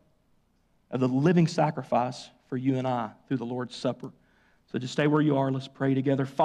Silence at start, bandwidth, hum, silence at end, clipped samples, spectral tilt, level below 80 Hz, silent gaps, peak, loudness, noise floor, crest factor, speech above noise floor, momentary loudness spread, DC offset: 0.9 s; 10 kHz; none; 0 s; under 0.1%; -7.5 dB/octave; -68 dBFS; none; -12 dBFS; -28 LUFS; -68 dBFS; 16 dB; 41 dB; 13 LU; under 0.1%